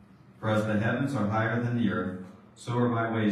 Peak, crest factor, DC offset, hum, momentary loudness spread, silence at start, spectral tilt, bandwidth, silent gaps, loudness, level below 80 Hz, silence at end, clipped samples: -14 dBFS; 14 dB; under 0.1%; none; 11 LU; 0.4 s; -7.5 dB/octave; 11.5 kHz; none; -28 LUFS; -66 dBFS; 0 s; under 0.1%